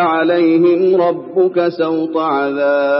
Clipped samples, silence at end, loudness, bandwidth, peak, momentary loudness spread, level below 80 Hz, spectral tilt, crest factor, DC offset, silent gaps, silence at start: under 0.1%; 0 s; -14 LUFS; 5.8 kHz; -2 dBFS; 5 LU; -70 dBFS; -4.5 dB/octave; 12 dB; under 0.1%; none; 0 s